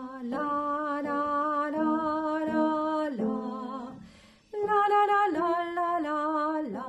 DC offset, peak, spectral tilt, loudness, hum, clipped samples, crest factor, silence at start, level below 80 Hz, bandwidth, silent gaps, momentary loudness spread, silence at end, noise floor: under 0.1%; -14 dBFS; -6.5 dB/octave; -28 LUFS; none; under 0.1%; 14 dB; 0 s; -66 dBFS; 9.2 kHz; none; 11 LU; 0 s; -54 dBFS